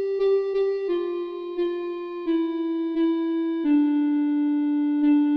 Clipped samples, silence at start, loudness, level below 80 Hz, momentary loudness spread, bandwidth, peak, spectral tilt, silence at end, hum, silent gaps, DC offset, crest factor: under 0.1%; 0 s; -24 LUFS; -64 dBFS; 9 LU; 5.4 kHz; -12 dBFS; -7 dB/octave; 0 s; none; none; under 0.1%; 10 dB